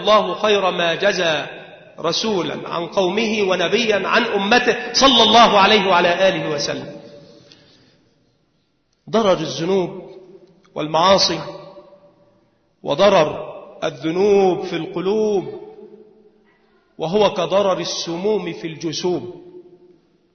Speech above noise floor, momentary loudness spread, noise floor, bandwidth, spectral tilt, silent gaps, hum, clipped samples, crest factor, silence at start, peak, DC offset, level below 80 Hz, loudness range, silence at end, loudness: 48 dB; 16 LU; -65 dBFS; 6.6 kHz; -3.5 dB/octave; none; none; under 0.1%; 18 dB; 0 s; -2 dBFS; under 0.1%; -54 dBFS; 10 LU; 0.75 s; -17 LUFS